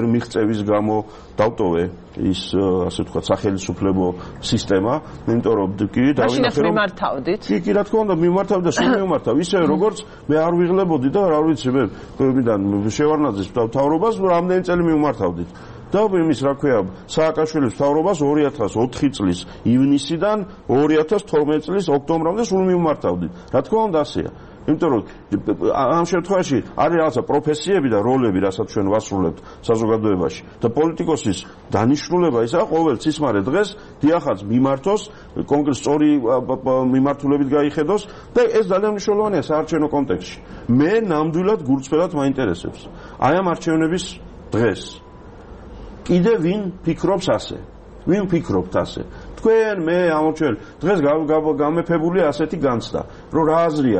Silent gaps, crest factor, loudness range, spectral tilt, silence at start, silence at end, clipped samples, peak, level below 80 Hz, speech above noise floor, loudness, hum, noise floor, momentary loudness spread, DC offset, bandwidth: none; 16 dB; 3 LU; -6.5 dB/octave; 0 s; 0 s; under 0.1%; -2 dBFS; -44 dBFS; 21 dB; -19 LUFS; none; -39 dBFS; 7 LU; under 0.1%; 8.8 kHz